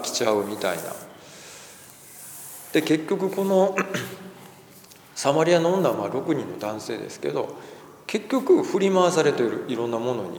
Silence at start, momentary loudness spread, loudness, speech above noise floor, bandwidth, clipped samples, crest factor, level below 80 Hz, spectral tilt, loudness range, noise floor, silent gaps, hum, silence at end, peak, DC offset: 0 s; 22 LU; -24 LUFS; 25 dB; over 20 kHz; under 0.1%; 18 dB; -74 dBFS; -5 dB/octave; 3 LU; -49 dBFS; none; none; 0 s; -6 dBFS; under 0.1%